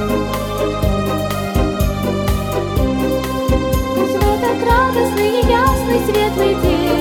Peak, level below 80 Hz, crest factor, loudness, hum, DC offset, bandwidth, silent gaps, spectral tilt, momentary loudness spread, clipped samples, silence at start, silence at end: 0 dBFS; -24 dBFS; 14 dB; -16 LUFS; none; under 0.1%; 19 kHz; none; -6 dB/octave; 5 LU; under 0.1%; 0 s; 0 s